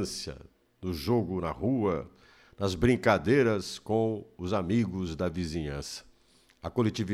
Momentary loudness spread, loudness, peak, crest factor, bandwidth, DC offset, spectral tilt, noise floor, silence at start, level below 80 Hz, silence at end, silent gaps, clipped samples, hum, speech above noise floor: 15 LU; -30 LUFS; -10 dBFS; 20 dB; 14.5 kHz; under 0.1%; -6 dB/octave; -63 dBFS; 0 s; -50 dBFS; 0 s; none; under 0.1%; none; 34 dB